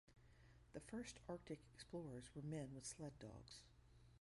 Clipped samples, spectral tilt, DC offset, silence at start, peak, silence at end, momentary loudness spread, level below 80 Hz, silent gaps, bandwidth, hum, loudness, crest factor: under 0.1%; -5 dB/octave; under 0.1%; 0.05 s; -38 dBFS; 0 s; 9 LU; -72 dBFS; none; 11.5 kHz; none; -55 LUFS; 18 dB